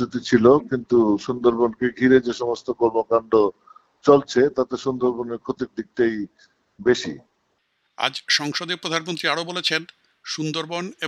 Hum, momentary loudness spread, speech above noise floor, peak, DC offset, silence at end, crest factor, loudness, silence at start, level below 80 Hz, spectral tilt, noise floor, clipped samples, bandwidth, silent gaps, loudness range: none; 12 LU; 49 dB; -2 dBFS; under 0.1%; 0 s; 20 dB; -21 LUFS; 0 s; -58 dBFS; -4.5 dB/octave; -70 dBFS; under 0.1%; 11.5 kHz; none; 6 LU